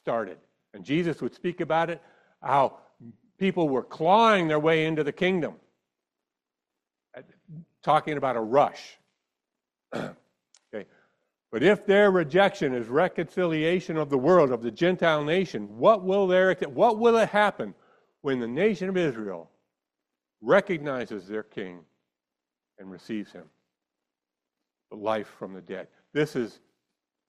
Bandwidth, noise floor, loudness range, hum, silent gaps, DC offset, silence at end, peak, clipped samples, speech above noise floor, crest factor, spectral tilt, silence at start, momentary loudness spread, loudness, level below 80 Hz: 12 kHz; -89 dBFS; 13 LU; none; none; under 0.1%; 0.8 s; -6 dBFS; under 0.1%; 64 dB; 20 dB; -6.5 dB/octave; 0.05 s; 18 LU; -25 LUFS; -68 dBFS